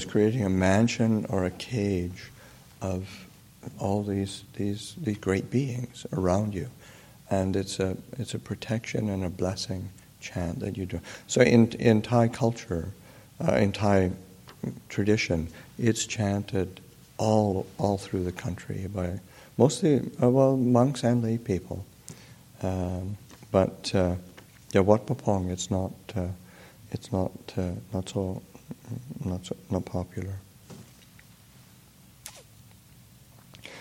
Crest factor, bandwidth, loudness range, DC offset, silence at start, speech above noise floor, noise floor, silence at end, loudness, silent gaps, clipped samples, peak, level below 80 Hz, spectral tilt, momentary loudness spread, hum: 24 dB; 16.5 kHz; 9 LU; under 0.1%; 0 s; 28 dB; -54 dBFS; 0 s; -28 LUFS; none; under 0.1%; -4 dBFS; -54 dBFS; -6 dB/octave; 19 LU; none